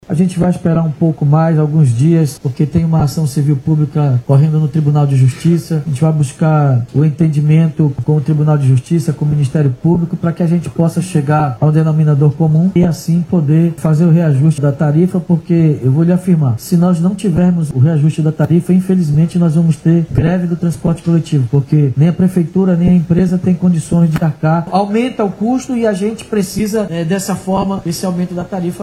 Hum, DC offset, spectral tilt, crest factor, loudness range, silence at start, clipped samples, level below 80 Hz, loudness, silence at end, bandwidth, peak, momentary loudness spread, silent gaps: none; under 0.1%; -8.5 dB/octave; 12 dB; 2 LU; 0.1 s; under 0.1%; -42 dBFS; -13 LUFS; 0 s; 12.5 kHz; 0 dBFS; 5 LU; none